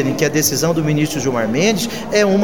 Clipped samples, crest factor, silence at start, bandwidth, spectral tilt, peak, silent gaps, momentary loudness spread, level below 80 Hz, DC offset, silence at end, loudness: under 0.1%; 14 dB; 0 s; 19.5 kHz; -4.5 dB/octave; -2 dBFS; none; 3 LU; -46 dBFS; 1%; 0 s; -16 LUFS